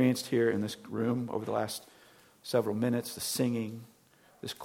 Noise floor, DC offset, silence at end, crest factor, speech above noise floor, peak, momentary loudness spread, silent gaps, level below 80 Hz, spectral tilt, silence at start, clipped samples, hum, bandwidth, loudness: -63 dBFS; under 0.1%; 0 s; 18 dB; 32 dB; -14 dBFS; 13 LU; none; -74 dBFS; -5 dB/octave; 0 s; under 0.1%; none; 17 kHz; -32 LUFS